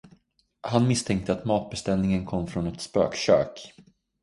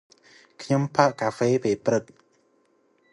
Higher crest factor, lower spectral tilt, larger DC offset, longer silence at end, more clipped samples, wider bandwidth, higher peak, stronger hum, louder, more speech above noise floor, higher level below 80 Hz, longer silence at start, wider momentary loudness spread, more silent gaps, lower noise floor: about the same, 20 dB vs 22 dB; about the same, -6 dB/octave vs -6 dB/octave; neither; second, 0.4 s vs 1.1 s; neither; about the same, 11.5 kHz vs 11.5 kHz; about the same, -6 dBFS vs -4 dBFS; neither; about the same, -26 LUFS vs -24 LUFS; about the same, 39 dB vs 42 dB; first, -50 dBFS vs -66 dBFS; about the same, 0.65 s vs 0.6 s; first, 10 LU vs 6 LU; neither; about the same, -64 dBFS vs -65 dBFS